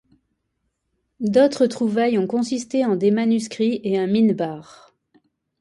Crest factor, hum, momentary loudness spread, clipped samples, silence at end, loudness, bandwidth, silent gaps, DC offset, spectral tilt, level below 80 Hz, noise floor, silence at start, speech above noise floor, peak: 16 dB; none; 7 LU; under 0.1%; 1 s; -20 LUFS; 11 kHz; none; under 0.1%; -6 dB/octave; -66 dBFS; -74 dBFS; 1.2 s; 55 dB; -4 dBFS